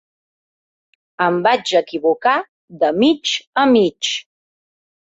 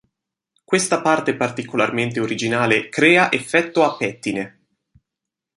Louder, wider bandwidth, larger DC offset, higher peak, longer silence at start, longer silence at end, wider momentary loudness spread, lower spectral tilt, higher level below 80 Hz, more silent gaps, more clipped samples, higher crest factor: about the same, -17 LUFS vs -18 LUFS; second, 8 kHz vs 11.5 kHz; neither; about the same, -2 dBFS vs 0 dBFS; first, 1.2 s vs 0.7 s; second, 0.85 s vs 1.1 s; second, 7 LU vs 10 LU; about the same, -4 dB/octave vs -4 dB/octave; about the same, -62 dBFS vs -62 dBFS; first, 2.49-2.68 s, 3.47-3.53 s vs none; neither; about the same, 16 dB vs 20 dB